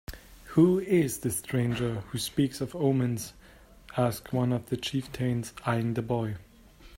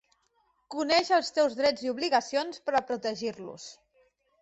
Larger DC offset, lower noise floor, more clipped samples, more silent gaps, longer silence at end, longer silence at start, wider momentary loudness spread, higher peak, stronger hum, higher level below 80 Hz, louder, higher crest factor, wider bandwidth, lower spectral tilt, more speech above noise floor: neither; second, -53 dBFS vs -71 dBFS; neither; neither; second, 0 s vs 0.7 s; second, 0.1 s vs 0.7 s; second, 12 LU vs 17 LU; about the same, -10 dBFS vs -12 dBFS; neither; first, -54 dBFS vs -70 dBFS; about the same, -29 LUFS vs -28 LUFS; about the same, 20 dB vs 18 dB; first, 16.5 kHz vs 8.2 kHz; first, -6 dB/octave vs -2.5 dB/octave; second, 25 dB vs 43 dB